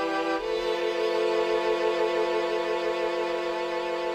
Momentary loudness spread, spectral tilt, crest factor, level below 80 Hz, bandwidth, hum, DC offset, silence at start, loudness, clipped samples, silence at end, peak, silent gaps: 4 LU; -3.5 dB/octave; 14 dB; -60 dBFS; 15 kHz; none; under 0.1%; 0 s; -27 LUFS; under 0.1%; 0 s; -14 dBFS; none